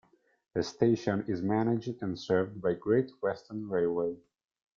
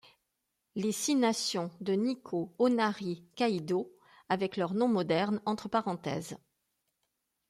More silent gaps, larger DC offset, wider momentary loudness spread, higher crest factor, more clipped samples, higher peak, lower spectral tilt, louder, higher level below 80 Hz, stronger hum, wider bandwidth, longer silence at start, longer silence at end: neither; neither; about the same, 8 LU vs 10 LU; about the same, 20 dB vs 18 dB; neither; first, -12 dBFS vs -16 dBFS; first, -7 dB/octave vs -4.5 dB/octave; about the same, -31 LUFS vs -32 LUFS; first, -68 dBFS vs -74 dBFS; neither; second, 7.6 kHz vs 15.5 kHz; second, 0.55 s vs 0.75 s; second, 0.6 s vs 1.15 s